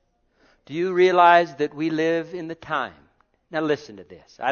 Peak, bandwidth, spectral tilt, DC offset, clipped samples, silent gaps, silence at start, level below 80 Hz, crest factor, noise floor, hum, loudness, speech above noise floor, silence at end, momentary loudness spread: -2 dBFS; 6.8 kHz; -6 dB/octave; under 0.1%; under 0.1%; none; 0.7 s; -66 dBFS; 20 dB; -63 dBFS; none; -21 LUFS; 41 dB; 0 s; 18 LU